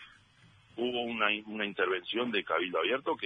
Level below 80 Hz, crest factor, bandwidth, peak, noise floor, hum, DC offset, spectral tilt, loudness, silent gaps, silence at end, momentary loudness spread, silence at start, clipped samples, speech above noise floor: -74 dBFS; 20 dB; 8.8 kHz; -14 dBFS; -61 dBFS; none; under 0.1%; -5.5 dB/octave; -32 LUFS; none; 0 s; 5 LU; 0 s; under 0.1%; 29 dB